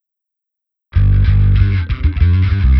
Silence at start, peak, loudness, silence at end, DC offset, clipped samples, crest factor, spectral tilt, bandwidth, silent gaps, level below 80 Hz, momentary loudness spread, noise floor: 0.95 s; 0 dBFS; -14 LUFS; 0 s; under 0.1%; under 0.1%; 12 dB; -10 dB/octave; 5.4 kHz; none; -16 dBFS; 5 LU; -81 dBFS